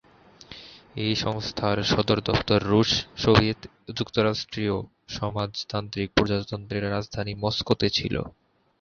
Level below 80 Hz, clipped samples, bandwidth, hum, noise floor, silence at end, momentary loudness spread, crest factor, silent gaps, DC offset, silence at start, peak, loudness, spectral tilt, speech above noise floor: -46 dBFS; under 0.1%; 7.2 kHz; none; -49 dBFS; 0.5 s; 15 LU; 24 dB; none; under 0.1%; 0.5 s; -2 dBFS; -25 LUFS; -5.5 dB/octave; 24 dB